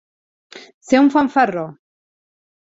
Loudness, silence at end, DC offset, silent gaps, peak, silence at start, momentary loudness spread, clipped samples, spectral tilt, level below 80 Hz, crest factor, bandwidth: -16 LUFS; 1 s; under 0.1%; 0.74-0.81 s; -2 dBFS; 0.55 s; 14 LU; under 0.1%; -5.5 dB/octave; -62 dBFS; 18 dB; 7.8 kHz